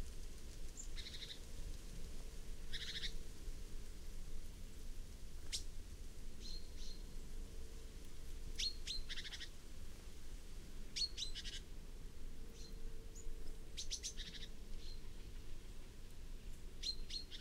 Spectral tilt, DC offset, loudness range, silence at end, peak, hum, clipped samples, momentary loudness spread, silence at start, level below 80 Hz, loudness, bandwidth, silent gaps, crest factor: -2 dB/octave; under 0.1%; 5 LU; 0 s; -28 dBFS; none; under 0.1%; 13 LU; 0 s; -48 dBFS; -50 LUFS; 15.5 kHz; none; 16 dB